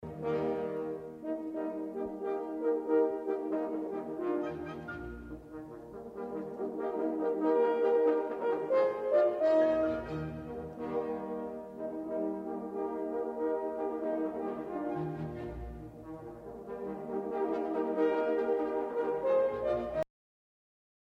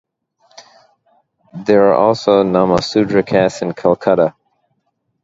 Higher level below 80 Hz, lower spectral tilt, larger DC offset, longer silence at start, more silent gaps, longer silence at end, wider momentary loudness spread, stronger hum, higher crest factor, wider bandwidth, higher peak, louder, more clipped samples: second, -58 dBFS vs -50 dBFS; first, -8.5 dB/octave vs -6.5 dB/octave; neither; second, 0 s vs 1.55 s; neither; about the same, 1 s vs 0.95 s; first, 14 LU vs 6 LU; neither; about the same, 16 dB vs 16 dB; second, 6.8 kHz vs 8 kHz; second, -16 dBFS vs 0 dBFS; second, -33 LUFS vs -14 LUFS; neither